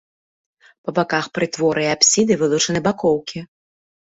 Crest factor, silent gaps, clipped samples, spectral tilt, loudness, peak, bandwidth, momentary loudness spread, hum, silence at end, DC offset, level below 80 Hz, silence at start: 18 dB; none; under 0.1%; -3 dB/octave; -18 LUFS; -2 dBFS; 8 kHz; 12 LU; none; 0.7 s; under 0.1%; -56 dBFS; 0.85 s